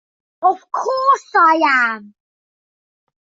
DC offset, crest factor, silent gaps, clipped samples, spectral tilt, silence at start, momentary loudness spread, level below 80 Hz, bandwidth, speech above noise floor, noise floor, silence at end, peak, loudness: under 0.1%; 16 dB; none; under 0.1%; -2.5 dB/octave; 0.4 s; 9 LU; -74 dBFS; 7.8 kHz; over 74 dB; under -90 dBFS; 1.3 s; -2 dBFS; -15 LUFS